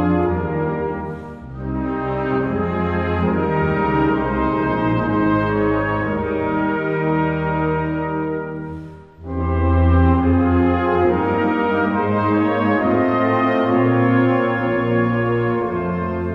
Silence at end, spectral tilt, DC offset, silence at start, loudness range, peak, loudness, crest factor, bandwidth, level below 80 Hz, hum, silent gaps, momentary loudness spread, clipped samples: 0 s; -10 dB/octave; 0.1%; 0 s; 4 LU; -4 dBFS; -19 LUFS; 14 dB; 5.4 kHz; -32 dBFS; none; none; 9 LU; under 0.1%